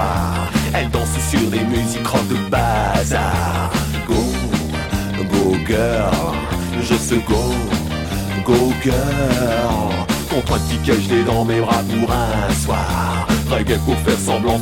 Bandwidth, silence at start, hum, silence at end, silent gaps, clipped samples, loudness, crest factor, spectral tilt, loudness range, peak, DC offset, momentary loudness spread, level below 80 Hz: 18 kHz; 0 s; none; 0 s; none; under 0.1%; -18 LUFS; 16 dB; -5.5 dB/octave; 1 LU; 0 dBFS; under 0.1%; 4 LU; -28 dBFS